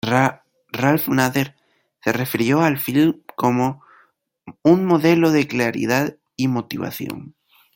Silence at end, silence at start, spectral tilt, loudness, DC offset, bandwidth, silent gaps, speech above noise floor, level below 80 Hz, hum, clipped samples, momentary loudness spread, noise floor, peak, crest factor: 0.45 s; 0.05 s; -6 dB/octave; -19 LUFS; under 0.1%; 17 kHz; none; 40 dB; -60 dBFS; none; under 0.1%; 12 LU; -58 dBFS; -2 dBFS; 18 dB